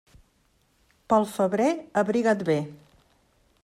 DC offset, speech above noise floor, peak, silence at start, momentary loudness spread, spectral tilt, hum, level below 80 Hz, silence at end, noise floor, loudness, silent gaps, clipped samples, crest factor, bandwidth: under 0.1%; 43 dB; -8 dBFS; 1.1 s; 4 LU; -6.5 dB/octave; none; -64 dBFS; 0.9 s; -66 dBFS; -25 LUFS; none; under 0.1%; 18 dB; 15.5 kHz